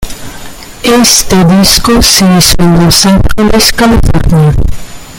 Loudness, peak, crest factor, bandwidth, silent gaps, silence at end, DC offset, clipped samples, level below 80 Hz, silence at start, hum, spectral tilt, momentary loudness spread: -5 LUFS; 0 dBFS; 6 dB; over 20 kHz; none; 0 s; under 0.1%; 2%; -16 dBFS; 0 s; none; -4 dB/octave; 16 LU